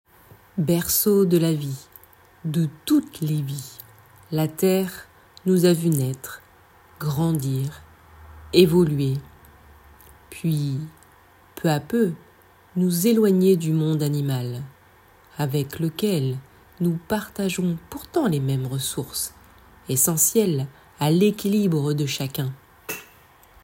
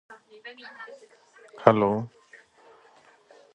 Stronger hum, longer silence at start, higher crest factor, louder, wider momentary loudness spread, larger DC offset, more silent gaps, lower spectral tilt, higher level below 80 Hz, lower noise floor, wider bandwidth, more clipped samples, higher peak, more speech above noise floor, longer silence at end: neither; first, 0.55 s vs 0.1 s; second, 22 dB vs 28 dB; about the same, -23 LUFS vs -23 LUFS; second, 16 LU vs 24 LU; neither; neither; second, -5.5 dB/octave vs -8 dB/octave; first, -56 dBFS vs -66 dBFS; second, -53 dBFS vs -57 dBFS; first, 16.5 kHz vs 9 kHz; neither; about the same, -2 dBFS vs 0 dBFS; about the same, 32 dB vs 31 dB; second, 0.6 s vs 1.5 s